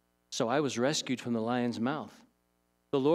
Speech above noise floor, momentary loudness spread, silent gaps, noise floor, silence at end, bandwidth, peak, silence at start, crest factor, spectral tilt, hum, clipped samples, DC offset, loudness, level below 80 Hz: 43 dB; 9 LU; none; -75 dBFS; 0 s; 13.5 kHz; -16 dBFS; 0.3 s; 16 dB; -4.5 dB/octave; 60 Hz at -55 dBFS; under 0.1%; under 0.1%; -32 LUFS; -82 dBFS